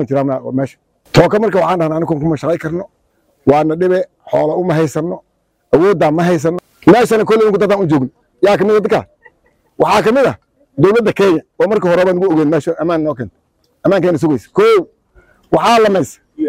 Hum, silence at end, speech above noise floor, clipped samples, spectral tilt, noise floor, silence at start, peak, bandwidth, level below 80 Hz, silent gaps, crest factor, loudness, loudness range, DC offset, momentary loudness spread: none; 0 s; 47 dB; under 0.1%; -6.5 dB/octave; -59 dBFS; 0 s; 0 dBFS; 16 kHz; -46 dBFS; none; 14 dB; -13 LUFS; 3 LU; under 0.1%; 10 LU